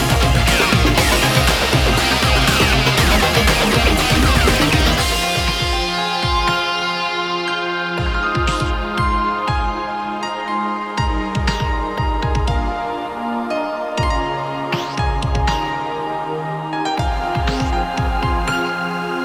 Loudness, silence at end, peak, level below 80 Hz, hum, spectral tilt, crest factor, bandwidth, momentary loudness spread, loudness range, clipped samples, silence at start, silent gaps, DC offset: -17 LUFS; 0 s; -2 dBFS; -24 dBFS; none; -4 dB/octave; 16 dB; 19 kHz; 9 LU; 7 LU; under 0.1%; 0 s; none; under 0.1%